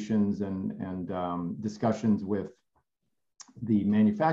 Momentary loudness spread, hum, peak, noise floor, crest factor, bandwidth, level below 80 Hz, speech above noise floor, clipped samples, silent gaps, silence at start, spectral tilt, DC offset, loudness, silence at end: 10 LU; none; -12 dBFS; -83 dBFS; 18 dB; 7.6 kHz; -70 dBFS; 55 dB; under 0.1%; none; 0 s; -8 dB/octave; under 0.1%; -29 LUFS; 0 s